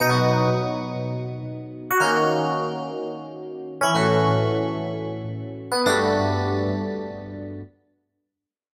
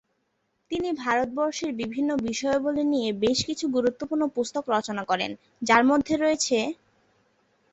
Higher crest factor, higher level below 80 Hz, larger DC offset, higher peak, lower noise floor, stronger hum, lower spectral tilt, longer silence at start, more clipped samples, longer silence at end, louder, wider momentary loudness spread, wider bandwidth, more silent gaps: second, 16 dB vs 22 dB; about the same, -58 dBFS vs -60 dBFS; neither; second, -8 dBFS vs -4 dBFS; first, -84 dBFS vs -74 dBFS; neither; first, -5.5 dB/octave vs -3.5 dB/octave; second, 0 s vs 0.7 s; neither; about the same, 1.1 s vs 1 s; about the same, -23 LUFS vs -25 LUFS; first, 16 LU vs 8 LU; first, 16 kHz vs 8.2 kHz; neither